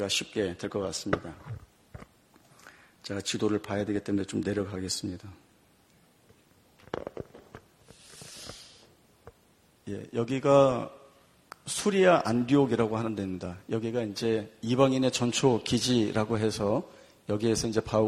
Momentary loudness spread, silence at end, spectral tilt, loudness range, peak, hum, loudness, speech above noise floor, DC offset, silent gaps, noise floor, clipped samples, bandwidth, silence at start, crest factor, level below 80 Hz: 21 LU; 0 s; -5 dB/octave; 19 LU; -8 dBFS; none; -28 LUFS; 36 dB; under 0.1%; none; -63 dBFS; under 0.1%; 14.5 kHz; 0 s; 22 dB; -58 dBFS